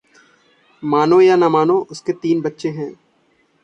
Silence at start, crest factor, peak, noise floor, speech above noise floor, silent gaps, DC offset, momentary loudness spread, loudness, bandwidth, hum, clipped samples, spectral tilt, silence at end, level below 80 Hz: 0.8 s; 14 dB; -2 dBFS; -60 dBFS; 44 dB; none; under 0.1%; 16 LU; -16 LUFS; 8.4 kHz; none; under 0.1%; -7 dB/octave; 0.7 s; -64 dBFS